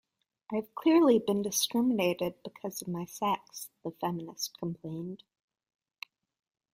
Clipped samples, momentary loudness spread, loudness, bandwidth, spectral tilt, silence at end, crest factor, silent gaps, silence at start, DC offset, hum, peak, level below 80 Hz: under 0.1%; 19 LU; -31 LUFS; 16 kHz; -4.5 dB/octave; 1.55 s; 18 dB; none; 0.5 s; under 0.1%; none; -14 dBFS; -74 dBFS